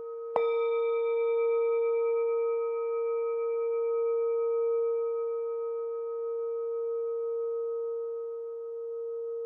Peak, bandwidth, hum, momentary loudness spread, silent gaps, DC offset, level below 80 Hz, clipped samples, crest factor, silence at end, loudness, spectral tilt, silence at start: -10 dBFS; 3.8 kHz; none; 8 LU; none; under 0.1%; under -90 dBFS; under 0.1%; 20 dB; 0 s; -31 LUFS; -0.5 dB/octave; 0 s